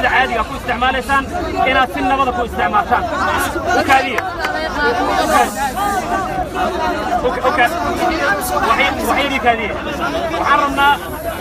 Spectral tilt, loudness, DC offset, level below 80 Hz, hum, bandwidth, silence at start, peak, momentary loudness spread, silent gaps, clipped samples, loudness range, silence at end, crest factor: -4 dB/octave; -16 LUFS; under 0.1%; -34 dBFS; none; 15.5 kHz; 0 s; 0 dBFS; 6 LU; none; under 0.1%; 1 LU; 0 s; 16 dB